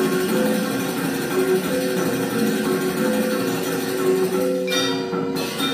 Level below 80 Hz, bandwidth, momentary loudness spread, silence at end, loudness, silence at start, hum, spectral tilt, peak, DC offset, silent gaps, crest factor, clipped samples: -60 dBFS; 15.5 kHz; 3 LU; 0 s; -21 LUFS; 0 s; none; -4.5 dB/octave; -8 dBFS; under 0.1%; none; 14 dB; under 0.1%